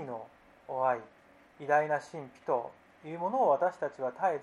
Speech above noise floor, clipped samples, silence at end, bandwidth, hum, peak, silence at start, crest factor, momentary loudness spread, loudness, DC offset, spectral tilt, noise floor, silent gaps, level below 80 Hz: 21 dB; under 0.1%; 0 s; 11 kHz; none; -14 dBFS; 0 s; 18 dB; 17 LU; -32 LUFS; under 0.1%; -6.5 dB/octave; -52 dBFS; none; -78 dBFS